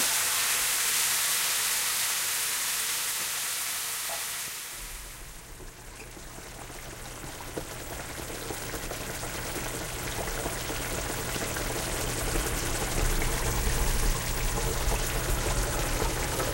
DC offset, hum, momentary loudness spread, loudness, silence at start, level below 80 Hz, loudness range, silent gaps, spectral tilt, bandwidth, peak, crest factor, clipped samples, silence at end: under 0.1%; none; 17 LU; -29 LUFS; 0 s; -36 dBFS; 13 LU; none; -2 dB/octave; 16.5 kHz; -14 dBFS; 16 dB; under 0.1%; 0 s